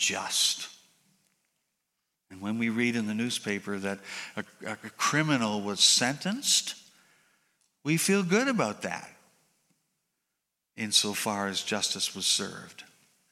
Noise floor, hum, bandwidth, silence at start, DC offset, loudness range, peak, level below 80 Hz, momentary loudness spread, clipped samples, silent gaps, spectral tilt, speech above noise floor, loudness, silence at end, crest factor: -84 dBFS; none; 16 kHz; 0 s; under 0.1%; 6 LU; -8 dBFS; -78 dBFS; 14 LU; under 0.1%; none; -2.5 dB/octave; 55 dB; -27 LUFS; 0.45 s; 22 dB